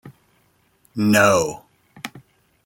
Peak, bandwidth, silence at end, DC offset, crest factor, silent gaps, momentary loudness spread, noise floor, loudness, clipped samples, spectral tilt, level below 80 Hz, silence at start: -2 dBFS; 17 kHz; 0.45 s; under 0.1%; 22 dB; none; 21 LU; -62 dBFS; -17 LUFS; under 0.1%; -4.5 dB/octave; -60 dBFS; 0.05 s